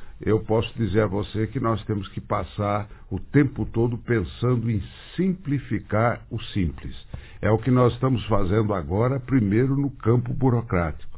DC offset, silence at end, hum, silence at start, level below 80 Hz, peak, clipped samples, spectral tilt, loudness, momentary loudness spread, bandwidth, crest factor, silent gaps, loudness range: under 0.1%; 0 s; none; 0 s; -40 dBFS; -4 dBFS; under 0.1%; -12 dB/octave; -24 LUFS; 8 LU; 4 kHz; 18 dB; none; 4 LU